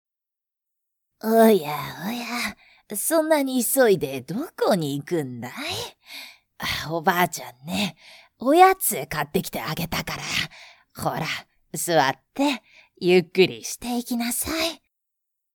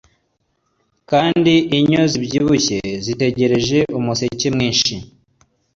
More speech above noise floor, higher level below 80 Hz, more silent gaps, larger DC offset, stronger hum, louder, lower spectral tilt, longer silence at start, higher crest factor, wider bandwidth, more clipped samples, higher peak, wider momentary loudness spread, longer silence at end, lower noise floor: first, 64 dB vs 51 dB; second, -54 dBFS vs -46 dBFS; neither; neither; neither; second, -23 LUFS vs -16 LUFS; about the same, -4 dB/octave vs -4.5 dB/octave; first, 1.25 s vs 1.1 s; first, 24 dB vs 14 dB; first, 19.5 kHz vs 7.8 kHz; neither; about the same, -2 dBFS vs -2 dBFS; first, 14 LU vs 6 LU; about the same, 0.8 s vs 0.7 s; first, -87 dBFS vs -67 dBFS